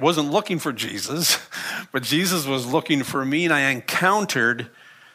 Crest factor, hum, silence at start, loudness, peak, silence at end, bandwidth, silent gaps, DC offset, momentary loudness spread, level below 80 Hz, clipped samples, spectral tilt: 18 dB; none; 0 s; -21 LUFS; -4 dBFS; 0.25 s; 15.5 kHz; none; under 0.1%; 8 LU; -68 dBFS; under 0.1%; -3.5 dB/octave